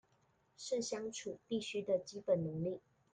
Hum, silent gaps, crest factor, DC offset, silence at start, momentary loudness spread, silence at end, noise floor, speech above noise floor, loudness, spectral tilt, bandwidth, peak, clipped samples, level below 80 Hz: none; none; 18 dB; under 0.1%; 0.6 s; 9 LU; 0.35 s; -75 dBFS; 36 dB; -40 LUFS; -5 dB/octave; 9.6 kHz; -22 dBFS; under 0.1%; -76 dBFS